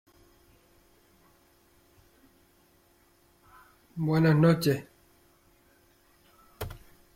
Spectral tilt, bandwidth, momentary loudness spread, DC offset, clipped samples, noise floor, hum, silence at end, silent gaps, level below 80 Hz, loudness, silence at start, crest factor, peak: -7 dB/octave; 16.5 kHz; 22 LU; under 0.1%; under 0.1%; -64 dBFS; none; 0.4 s; none; -60 dBFS; -26 LUFS; 3.95 s; 22 dB; -12 dBFS